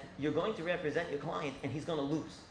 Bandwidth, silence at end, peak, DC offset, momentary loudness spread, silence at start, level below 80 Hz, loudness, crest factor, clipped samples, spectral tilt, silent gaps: 10.5 kHz; 0 s; -20 dBFS; under 0.1%; 4 LU; 0 s; -64 dBFS; -37 LUFS; 18 dB; under 0.1%; -6 dB/octave; none